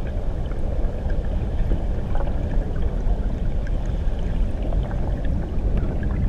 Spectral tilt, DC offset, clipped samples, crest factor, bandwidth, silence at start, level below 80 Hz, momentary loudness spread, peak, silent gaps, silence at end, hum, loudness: -9 dB/octave; under 0.1%; under 0.1%; 12 dB; 5.4 kHz; 0 s; -22 dBFS; 2 LU; -8 dBFS; none; 0 s; none; -27 LUFS